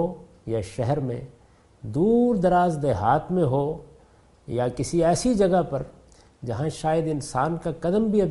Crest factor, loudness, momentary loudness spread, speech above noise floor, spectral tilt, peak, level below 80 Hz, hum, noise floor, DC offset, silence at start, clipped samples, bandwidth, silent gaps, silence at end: 16 dB; -24 LUFS; 12 LU; 32 dB; -7 dB/octave; -8 dBFS; -46 dBFS; none; -55 dBFS; under 0.1%; 0 s; under 0.1%; 11.5 kHz; none; 0 s